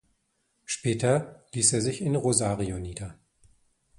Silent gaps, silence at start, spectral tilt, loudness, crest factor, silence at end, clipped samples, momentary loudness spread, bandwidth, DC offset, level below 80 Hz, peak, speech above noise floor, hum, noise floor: none; 0.7 s; -4.5 dB/octave; -26 LUFS; 24 dB; 0.85 s; under 0.1%; 15 LU; 11.5 kHz; under 0.1%; -52 dBFS; -6 dBFS; 47 dB; none; -74 dBFS